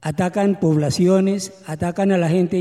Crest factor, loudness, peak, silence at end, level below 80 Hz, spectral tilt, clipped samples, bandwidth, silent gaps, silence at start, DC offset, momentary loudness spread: 14 dB; -19 LUFS; -4 dBFS; 0 s; -54 dBFS; -6.5 dB/octave; under 0.1%; 13 kHz; none; 0 s; under 0.1%; 9 LU